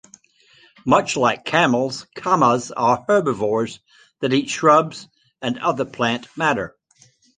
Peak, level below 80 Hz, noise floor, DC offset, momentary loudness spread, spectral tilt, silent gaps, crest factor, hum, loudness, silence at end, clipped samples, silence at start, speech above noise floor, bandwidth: -2 dBFS; -58 dBFS; -56 dBFS; under 0.1%; 12 LU; -4.5 dB/octave; none; 18 dB; none; -19 LUFS; 0.7 s; under 0.1%; 0.85 s; 37 dB; 9.8 kHz